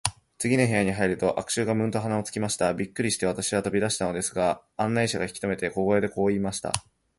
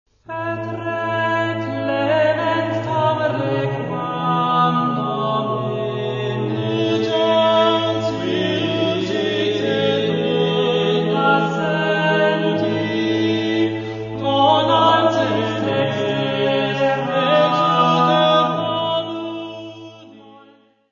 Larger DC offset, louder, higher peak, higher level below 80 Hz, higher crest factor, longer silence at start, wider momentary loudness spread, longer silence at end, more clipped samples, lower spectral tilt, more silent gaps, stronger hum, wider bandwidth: neither; second, -26 LUFS vs -18 LUFS; about the same, 0 dBFS vs -2 dBFS; about the same, -54 dBFS vs -58 dBFS; first, 26 dB vs 16 dB; second, 0.05 s vs 0.3 s; second, 6 LU vs 9 LU; second, 0.4 s vs 0.55 s; neither; second, -4.5 dB/octave vs -6.5 dB/octave; neither; neither; first, 12 kHz vs 7.4 kHz